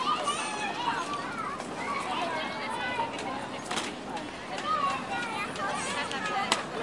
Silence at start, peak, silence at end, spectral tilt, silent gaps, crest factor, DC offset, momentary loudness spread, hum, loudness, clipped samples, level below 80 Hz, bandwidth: 0 s; -6 dBFS; 0 s; -2.5 dB/octave; none; 26 dB; under 0.1%; 6 LU; none; -32 LUFS; under 0.1%; -64 dBFS; 11.5 kHz